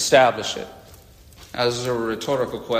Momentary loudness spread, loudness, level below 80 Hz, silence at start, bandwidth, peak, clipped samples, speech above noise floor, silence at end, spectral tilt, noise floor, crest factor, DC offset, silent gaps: 16 LU; -22 LUFS; -52 dBFS; 0 s; 15.5 kHz; -4 dBFS; under 0.1%; 26 dB; 0 s; -3.5 dB/octave; -47 dBFS; 18 dB; under 0.1%; none